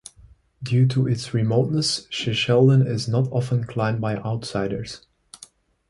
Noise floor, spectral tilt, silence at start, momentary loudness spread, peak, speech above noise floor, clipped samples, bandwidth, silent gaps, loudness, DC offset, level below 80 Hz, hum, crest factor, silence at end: -52 dBFS; -6 dB/octave; 0.6 s; 10 LU; -6 dBFS; 31 dB; under 0.1%; 11.5 kHz; none; -22 LUFS; under 0.1%; -54 dBFS; none; 18 dB; 0.95 s